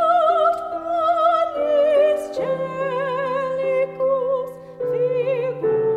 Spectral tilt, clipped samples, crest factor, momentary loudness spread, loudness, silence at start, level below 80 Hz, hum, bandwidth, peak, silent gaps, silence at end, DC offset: -6 dB/octave; under 0.1%; 14 dB; 8 LU; -20 LUFS; 0 s; -60 dBFS; none; 12 kHz; -6 dBFS; none; 0 s; under 0.1%